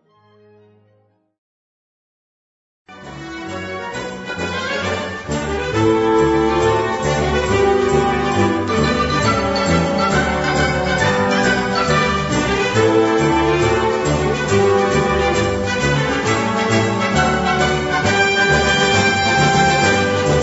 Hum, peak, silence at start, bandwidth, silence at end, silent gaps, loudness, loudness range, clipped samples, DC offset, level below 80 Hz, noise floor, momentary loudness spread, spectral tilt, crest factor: none; -2 dBFS; 2.9 s; 8 kHz; 0 s; none; -16 LUFS; 11 LU; under 0.1%; under 0.1%; -34 dBFS; -59 dBFS; 9 LU; -4.5 dB/octave; 16 dB